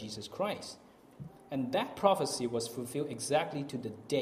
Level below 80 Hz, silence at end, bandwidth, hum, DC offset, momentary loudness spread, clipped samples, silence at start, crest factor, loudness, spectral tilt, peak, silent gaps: -70 dBFS; 0 s; 15.5 kHz; none; under 0.1%; 19 LU; under 0.1%; 0 s; 24 dB; -34 LUFS; -4.5 dB/octave; -12 dBFS; none